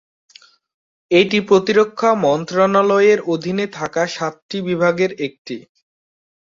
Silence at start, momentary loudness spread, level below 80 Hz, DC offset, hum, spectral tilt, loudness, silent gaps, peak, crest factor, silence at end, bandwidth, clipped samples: 1.1 s; 12 LU; -62 dBFS; under 0.1%; none; -5.5 dB/octave; -17 LUFS; 4.42-4.49 s, 5.38-5.45 s; -2 dBFS; 16 dB; 0.95 s; 7.6 kHz; under 0.1%